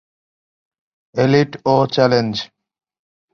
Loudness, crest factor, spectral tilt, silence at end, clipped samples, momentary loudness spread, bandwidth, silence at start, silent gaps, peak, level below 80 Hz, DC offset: -16 LUFS; 18 dB; -6.5 dB/octave; 0.9 s; under 0.1%; 12 LU; 7 kHz; 1.15 s; none; -2 dBFS; -56 dBFS; under 0.1%